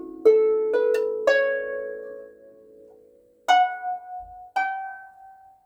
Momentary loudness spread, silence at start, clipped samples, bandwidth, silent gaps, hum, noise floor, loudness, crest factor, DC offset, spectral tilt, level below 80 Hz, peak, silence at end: 19 LU; 0 s; under 0.1%; 9 kHz; none; none; -56 dBFS; -23 LUFS; 18 dB; under 0.1%; -2 dB/octave; -66 dBFS; -6 dBFS; 0.35 s